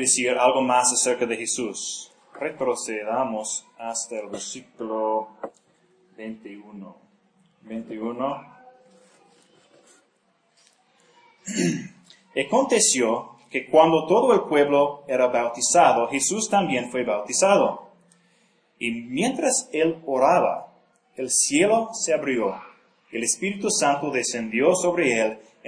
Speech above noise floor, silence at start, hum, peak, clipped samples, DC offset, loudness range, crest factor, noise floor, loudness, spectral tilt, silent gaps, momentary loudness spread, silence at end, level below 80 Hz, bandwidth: 44 dB; 0 s; none; -4 dBFS; under 0.1%; under 0.1%; 16 LU; 20 dB; -66 dBFS; -22 LUFS; -3 dB/octave; none; 17 LU; 0 s; -70 dBFS; 10.5 kHz